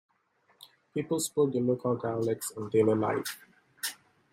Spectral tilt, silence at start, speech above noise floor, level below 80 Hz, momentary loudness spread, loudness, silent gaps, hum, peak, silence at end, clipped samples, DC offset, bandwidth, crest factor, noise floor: -5 dB/octave; 0.6 s; 41 dB; -74 dBFS; 11 LU; -30 LUFS; none; none; -14 dBFS; 0.4 s; under 0.1%; under 0.1%; 16 kHz; 18 dB; -70 dBFS